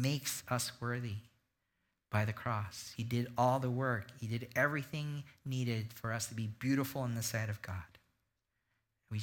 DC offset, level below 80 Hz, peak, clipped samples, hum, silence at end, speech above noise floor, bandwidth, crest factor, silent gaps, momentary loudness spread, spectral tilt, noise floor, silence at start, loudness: under 0.1%; -68 dBFS; -18 dBFS; under 0.1%; none; 0 s; 47 dB; 18 kHz; 20 dB; none; 10 LU; -5 dB/octave; -84 dBFS; 0 s; -37 LUFS